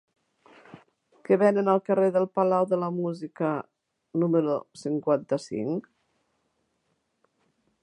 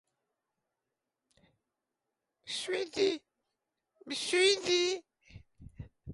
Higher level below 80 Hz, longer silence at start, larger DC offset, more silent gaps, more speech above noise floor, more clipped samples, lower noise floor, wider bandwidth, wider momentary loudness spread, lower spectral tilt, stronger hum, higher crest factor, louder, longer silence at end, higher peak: second, -76 dBFS vs -64 dBFS; second, 0.75 s vs 2.45 s; neither; neither; second, 50 dB vs 57 dB; neither; second, -75 dBFS vs -88 dBFS; about the same, 11 kHz vs 11.5 kHz; second, 10 LU vs 24 LU; first, -8 dB/octave vs -2.5 dB/octave; neither; about the same, 20 dB vs 20 dB; first, -26 LUFS vs -31 LUFS; first, 2.05 s vs 0 s; first, -8 dBFS vs -16 dBFS